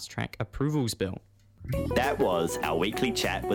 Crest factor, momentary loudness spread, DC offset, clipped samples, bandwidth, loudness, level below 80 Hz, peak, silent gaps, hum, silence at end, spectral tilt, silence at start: 16 dB; 9 LU; under 0.1%; under 0.1%; 18 kHz; -29 LUFS; -46 dBFS; -12 dBFS; none; none; 0 s; -5 dB/octave; 0 s